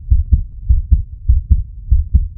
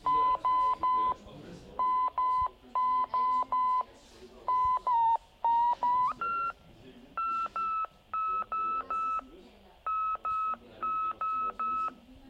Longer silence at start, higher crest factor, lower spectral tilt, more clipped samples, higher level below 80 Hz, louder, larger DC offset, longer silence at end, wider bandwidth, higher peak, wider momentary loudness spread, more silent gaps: about the same, 0 s vs 0.05 s; about the same, 14 dB vs 12 dB; first, -16 dB/octave vs -5 dB/octave; first, 0.2% vs under 0.1%; first, -14 dBFS vs -60 dBFS; first, -17 LUFS vs -30 LUFS; neither; about the same, 0.05 s vs 0 s; second, 0.6 kHz vs 8 kHz; first, 0 dBFS vs -20 dBFS; second, 3 LU vs 9 LU; neither